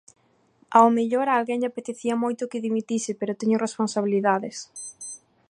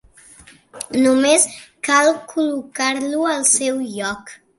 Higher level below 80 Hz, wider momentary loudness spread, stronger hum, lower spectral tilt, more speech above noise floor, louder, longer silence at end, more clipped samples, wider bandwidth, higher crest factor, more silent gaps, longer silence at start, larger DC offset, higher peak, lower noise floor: second, -76 dBFS vs -60 dBFS; first, 17 LU vs 12 LU; neither; first, -5 dB/octave vs -1.5 dB/octave; first, 39 dB vs 29 dB; second, -24 LUFS vs -17 LUFS; about the same, 0.3 s vs 0.25 s; neither; about the same, 11 kHz vs 12 kHz; about the same, 20 dB vs 18 dB; neither; about the same, 0.7 s vs 0.75 s; neither; about the same, -4 dBFS vs -2 dBFS; first, -62 dBFS vs -46 dBFS